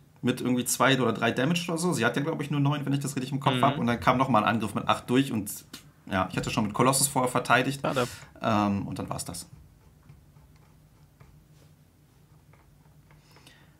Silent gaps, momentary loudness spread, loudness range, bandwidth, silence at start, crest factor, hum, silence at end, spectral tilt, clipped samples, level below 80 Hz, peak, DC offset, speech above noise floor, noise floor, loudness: none; 11 LU; 7 LU; 16 kHz; 0.25 s; 24 dB; none; 3.65 s; -4.5 dB/octave; under 0.1%; -58 dBFS; -4 dBFS; under 0.1%; 32 dB; -59 dBFS; -26 LUFS